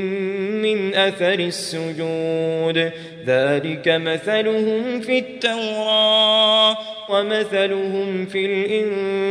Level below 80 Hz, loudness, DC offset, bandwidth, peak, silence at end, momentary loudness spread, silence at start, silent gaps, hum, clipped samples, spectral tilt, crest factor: -68 dBFS; -19 LUFS; under 0.1%; 11 kHz; -4 dBFS; 0 s; 10 LU; 0 s; none; none; under 0.1%; -4.5 dB/octave; 16 dB